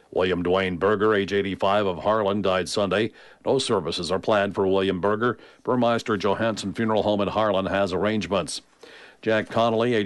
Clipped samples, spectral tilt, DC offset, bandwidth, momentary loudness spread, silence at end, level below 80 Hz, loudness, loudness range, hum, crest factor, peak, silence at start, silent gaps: under 0.1%; -5 dB/octave; under 0.1%; 11.5 kHz; 5 LU; 0 s; -56 dBFS; -23 LUFS; 1 LU; none; 14 dB; -10 dBFS; 0.15 s; none